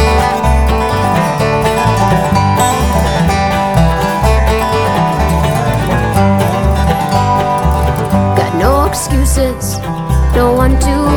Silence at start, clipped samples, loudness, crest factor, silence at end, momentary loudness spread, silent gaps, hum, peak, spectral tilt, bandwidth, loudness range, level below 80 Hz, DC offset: 0 s; under 0.1%; -12 LUFS; 10 dB; 0 s; 2 LU; none; none; 0 dBFS; -6 dB/octave; 19.5 kHz; 1 LU; -16 dBFS; under 0.1%